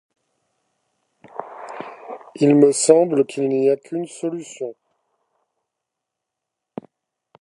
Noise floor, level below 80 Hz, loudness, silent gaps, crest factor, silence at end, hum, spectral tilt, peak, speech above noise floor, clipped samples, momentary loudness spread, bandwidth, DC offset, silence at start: -82 dBFS; -76 dBFS; -18 LUFS; none; 22 dB; 2.7 s; none; -5.5 dB/octave; 0 dBFS; 65 dB; under 0.1%; 23 LU; 11.5 kHz; under 0.1%; 1.4 s